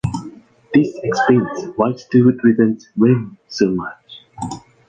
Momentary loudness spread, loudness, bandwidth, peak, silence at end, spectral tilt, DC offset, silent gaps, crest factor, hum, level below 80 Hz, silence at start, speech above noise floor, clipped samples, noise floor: 15 LU; -17 LUFS; 9 kHz; -2 dBFS; 0.3 s; -7 dB/octave; under 0.1%; none; 16 dB; none; -48 dBFS; 0.05 s; 23 dB; under 0.1%; -38 dBFS